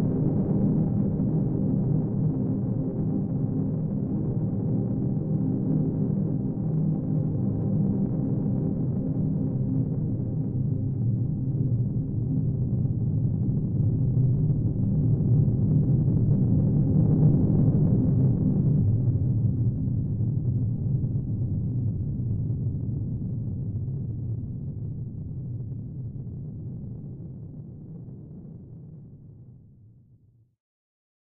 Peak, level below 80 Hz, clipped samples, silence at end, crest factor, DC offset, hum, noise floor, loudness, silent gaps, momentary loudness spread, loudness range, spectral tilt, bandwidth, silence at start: -10 dBFS; -42 dBFS; under 0.1%; 1.75 s; 14 dB; under 0.1%; none; -59 dBFS; -26 LUFS; none; 14 LU; 15 LU; -16.5 dB/octave; 1.7 kHz; 0 s